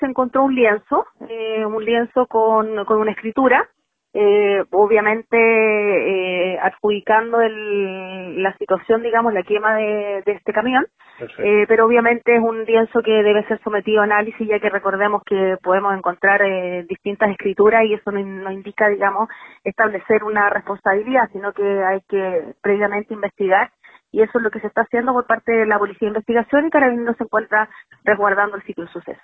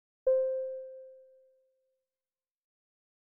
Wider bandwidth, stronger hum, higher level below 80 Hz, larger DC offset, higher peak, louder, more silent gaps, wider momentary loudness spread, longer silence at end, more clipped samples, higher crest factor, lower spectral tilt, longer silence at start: first, 3.8 kHz vs 1.7 kHz; neither; first, -58 dBFS vs -76 dBFS; neither; first, -2 dBFS vs -20 dBFS; first, -18 LUFS vs -32 LUFS; neither; second, 10 LU vs 22 LU; second, 0.1 s vs 2.15 s; neither; about the same, 16 dB vs 18 dB; first, -8.5 dB/octave vs 1 dB/octave; second, 0 s vs 0.25 s